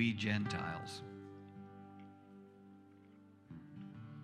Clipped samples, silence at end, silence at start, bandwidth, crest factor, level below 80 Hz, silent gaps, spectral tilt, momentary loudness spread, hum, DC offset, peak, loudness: under 0.1%; 0 s; 0 s; 12 kHz; 22 dB; -76 dBFS; none; -5.5 dB/octave; 24 LU; none; under 0.1%; -22 dBFS; -42 LUFS